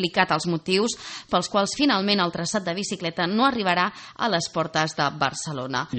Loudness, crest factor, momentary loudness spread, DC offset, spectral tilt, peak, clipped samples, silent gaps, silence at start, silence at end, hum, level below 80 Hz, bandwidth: -24 LUFS; 20 dB; 7 LU; under 0.1%; -4 dB/octave; -4 dBFS; under 0.1%; none; 0 s; 0 s; none; -60 dBFS; 8.8 kHz